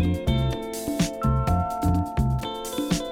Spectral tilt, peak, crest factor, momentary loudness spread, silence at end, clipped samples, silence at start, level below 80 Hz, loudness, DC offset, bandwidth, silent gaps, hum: -6 dB/octave; -10 dBFS; 14 dB; 6 LU; 0 s; under 0.1%; 0 s; -32 dBFS; -25 LUFS; under 0.1%; 18 kHz; none; none